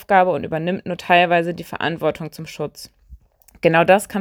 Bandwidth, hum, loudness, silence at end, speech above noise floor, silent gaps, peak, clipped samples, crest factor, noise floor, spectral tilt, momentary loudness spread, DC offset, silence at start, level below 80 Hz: over 20 kHz; none; -19 LUFS; 0 s; 28 dB; none; 0 dBFS; under 0.1%; 18 dB; -46 dBFS; -5.5 dB/octave; 15 LU; under 0.1%; 0 s; -52 dBFS